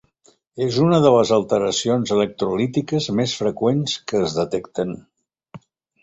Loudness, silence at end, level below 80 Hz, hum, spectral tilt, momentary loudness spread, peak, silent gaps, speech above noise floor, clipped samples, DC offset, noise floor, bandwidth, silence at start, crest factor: -20 LUFS; 0.45 s; -56 dBFS; none; -5.5 dB/octave; 11 LU; -2 dBFS; none; 39 dB; under 0.1%; under 0.1%; -59 dBFS; 8.2 kHz; 0.55 s; 18 dB